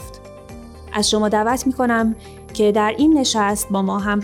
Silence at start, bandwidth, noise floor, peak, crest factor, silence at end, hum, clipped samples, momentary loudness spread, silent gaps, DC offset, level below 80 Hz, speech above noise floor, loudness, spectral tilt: 0 s; 17 kHz; -37 dBFS; -8 dBFS; 12 dB; 0 s; none; under 0.1%; 22 LU; none; under 0.1%; -42 dBFS; 20 dB; -18 LUFS; -4 dB/octave